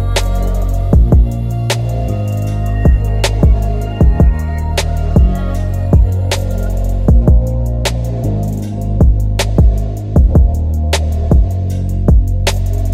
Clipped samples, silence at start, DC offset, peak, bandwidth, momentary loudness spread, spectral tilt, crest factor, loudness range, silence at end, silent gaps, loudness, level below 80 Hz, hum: under 0.1%; 0 s; 0.2%; 0 dBFS; 14.5 kHz; 7 LU; -6.5 dB/octave; 10 dB; 1 LU; 0 s; none; -14 LUFS; -14 dBFS; none